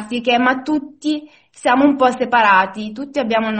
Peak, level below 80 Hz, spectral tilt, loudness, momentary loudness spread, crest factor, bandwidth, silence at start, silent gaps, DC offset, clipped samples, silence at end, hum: 0 dBFS; -58 dBFS; -4.5 dB/octave; -16 LUFS; 10 LU; 16 dB; 8.8 kHz; 0 s; none; under 0.1%; under 0.1%; 0 s; none